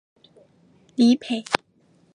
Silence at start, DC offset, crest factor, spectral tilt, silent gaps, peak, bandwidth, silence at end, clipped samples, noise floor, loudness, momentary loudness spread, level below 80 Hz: 1 s; under 0.1%; 24 dB; -4 dB/octave; none; 0 dBFS; 11 kHz; 0.6 s; under 0.1%; -60 dBFS; -22 LUFS; 9 LU; -66 dBFS